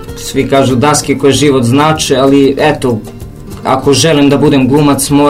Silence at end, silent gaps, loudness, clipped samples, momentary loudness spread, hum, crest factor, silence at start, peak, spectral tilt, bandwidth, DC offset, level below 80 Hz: 0 s; none; -9 LUFS; 0.9%; 10 LU; none; 8 dB; 0 s; 0 dBFS; -5 dB/octave; 16 kHz; under 0.1%; -32 dBFS